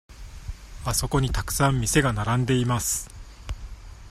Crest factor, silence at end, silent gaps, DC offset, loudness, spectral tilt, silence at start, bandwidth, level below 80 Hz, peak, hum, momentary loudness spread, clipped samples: 20 dB; 0 s; none; under 0.1%; -24 LUFS; -4.5 dB/octave; 0.1 s; 15 kHz; -36 dBFS; -6 dBFS; none; 20 LU; under 0.1%